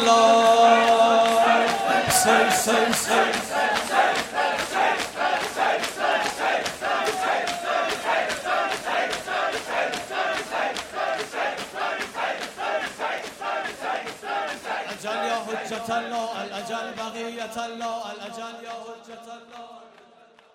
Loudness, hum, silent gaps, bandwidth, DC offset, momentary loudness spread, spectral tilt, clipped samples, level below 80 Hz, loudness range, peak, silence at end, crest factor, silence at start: -23 LUFS; none; none; 16 kHz; under 0.1%; 14 LU; -2 dB/octave; under 0.1%; -62 dBFS; 11 LU; -4 dBFS; 0.65 s; 20 dB; 0 s